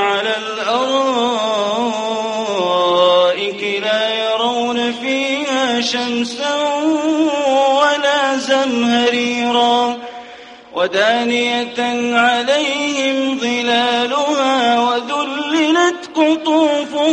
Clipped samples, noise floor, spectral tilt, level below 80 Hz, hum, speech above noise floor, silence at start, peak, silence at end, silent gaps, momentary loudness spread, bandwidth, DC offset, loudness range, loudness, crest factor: under 0.1%; -37 dBFS; -2.5 dB/octave; -64 dBFS; none; 21 dB; 0 s; -2 dBFS; 0 s; none; 6 LU; 10.5 kHz; under 0.1%; 2 LU; -16 LUFS; 14 dB